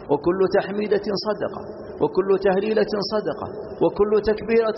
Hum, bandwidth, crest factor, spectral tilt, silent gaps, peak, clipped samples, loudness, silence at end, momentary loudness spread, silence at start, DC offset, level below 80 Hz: none; 6 kHz; 14 dB; -4.5 dB/octave; none; -8 dBFS; under 0.1%; -22 LUFS; 0 s; 10 LU; 0 s; under 0.1%; -48 dBFS